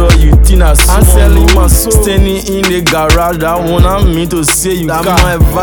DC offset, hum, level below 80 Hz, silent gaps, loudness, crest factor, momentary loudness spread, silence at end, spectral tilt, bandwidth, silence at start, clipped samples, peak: under 0.1%; none; -10 dBFS; none; -8 LUFS; 6 dB; 5 LU; 0 s; -4.5 dB/octave; over 20 kHz; 0 s; under 0.1%; 0 dBFS